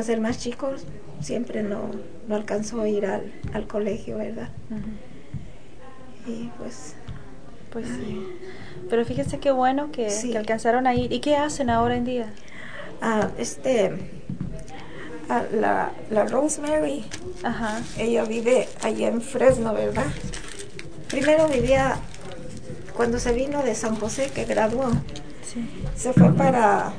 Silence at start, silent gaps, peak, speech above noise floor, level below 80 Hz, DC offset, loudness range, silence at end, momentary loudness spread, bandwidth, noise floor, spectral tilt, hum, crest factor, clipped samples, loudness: 0 s; none; -2 dBFS; 22 dB; -44 dBFS; 2%; 10 LU; 0 s; 18 LU; 10 kHz; -45 dBFS; -5.5 dB/octave; none; 22 dB; under 0.1%; -24 LUFS